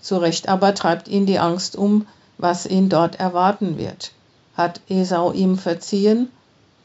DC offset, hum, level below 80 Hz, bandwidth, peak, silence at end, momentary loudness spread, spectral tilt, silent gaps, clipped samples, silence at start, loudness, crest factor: under 0.1%; none; -62 dBFS; 8 kHz; -2 dBFS; 0.55 s; 10 LU; -6 dB/octave; none; under 0.1%; 0.05 s; -19 LUFS; 16 dB